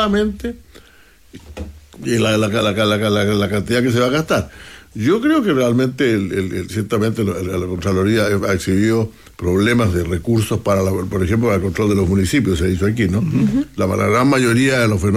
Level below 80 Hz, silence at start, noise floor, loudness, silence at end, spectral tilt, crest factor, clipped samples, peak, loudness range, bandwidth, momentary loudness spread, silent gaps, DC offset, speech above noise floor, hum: -40 dBFS; 0 s; -47 dBFS; -17 LUFS; 0 s; -6 dB/octave; 12 dB; under 0.1%; -4 dBFS; 2 LU; 15.5 kHz; 8 LU; none; under 0.1%; 31 dB; none